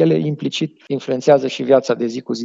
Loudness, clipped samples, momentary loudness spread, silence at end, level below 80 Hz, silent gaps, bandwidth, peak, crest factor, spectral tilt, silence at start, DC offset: -18 LUFS; under 0.1%; 9 LU; 0 s; -74 dBFS; none; 7.8 kHz; 0 dBFS; 18 dB; -6 dB/octave; 0 s; under 0.1%